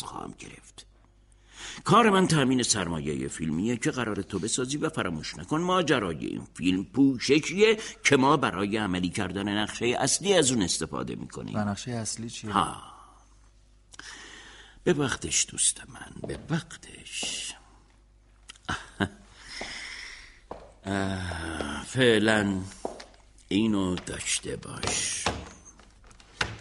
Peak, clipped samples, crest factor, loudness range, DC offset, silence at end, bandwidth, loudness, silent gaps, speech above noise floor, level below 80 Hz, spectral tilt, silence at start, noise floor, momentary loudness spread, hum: -8 dBFS; under 0.1%; 20 dB; 10 LU; under 0.1%; 0 s; 11.5 kHz; -27 LUFS; none; 31 dB; -52 dBFS; -3.5 dB/octave; 0 s; -58 dBFS; 20 LU; none